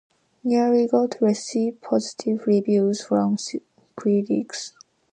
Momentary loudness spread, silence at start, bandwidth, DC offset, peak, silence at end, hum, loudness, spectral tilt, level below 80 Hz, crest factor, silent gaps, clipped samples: 12 LU; 0.45 s; 9.6 kHz; under 0.1%; -6 dBFS; 0.45 s; none; -22 LUFS; -6 dB/octave; -72 dBFS; 16 dB; none; under 0.1%